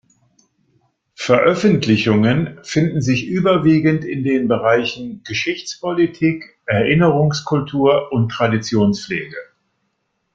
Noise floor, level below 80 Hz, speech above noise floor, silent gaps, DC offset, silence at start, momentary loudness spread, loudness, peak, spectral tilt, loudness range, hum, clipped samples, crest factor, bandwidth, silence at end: -70 dBFS; -52 dBFS; 54 dB; none; under 0.1%; 1.2 s; 10 LU; -17 LUFS; 0 dBFS; -6.5 dB/octave; 2 LU; none; under 0.1%; 16 dB; 7.8 kHz; 0.9 s